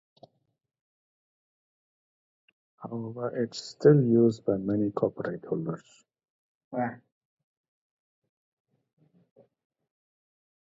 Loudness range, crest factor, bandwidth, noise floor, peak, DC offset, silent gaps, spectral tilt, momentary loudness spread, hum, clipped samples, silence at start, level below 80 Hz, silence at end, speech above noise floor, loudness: 15 LU; 24 dB; 7.8 kHz; -59 dBFS; -8 dBFS; under 0.1%; 6.30-6.71 s; -8 dB/octave; 17 LU; none; under 0.1%; 2.8 s; -70 dBFS; 3.75 s; 33 dB; -27 LUFS